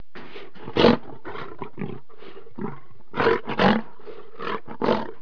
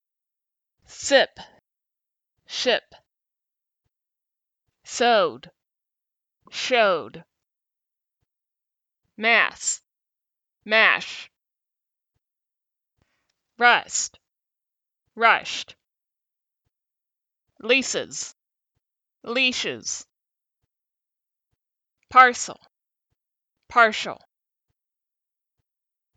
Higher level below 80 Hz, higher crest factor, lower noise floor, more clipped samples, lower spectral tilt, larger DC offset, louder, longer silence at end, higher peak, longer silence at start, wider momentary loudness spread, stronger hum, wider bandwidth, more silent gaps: first, -56 dBFS vs -72 dBFS; about the same, 26 dB vs 26 dB; second, -46 dBFS vs -87 dBFS; neither; first, -7 dB/octave vs -1 dB/octave; first, 3% vs under 0.1%; second, -24 LUFS vs -21 LUFS; second, 0.05 s vs 2 s; about the same, 0 dBFS vs 0 dBFS; second, 0.15 s vs 0.9 s; first, 23 LU vs 16 LU; neither; second, 5.4 kHz vs 9.4 kHz; neither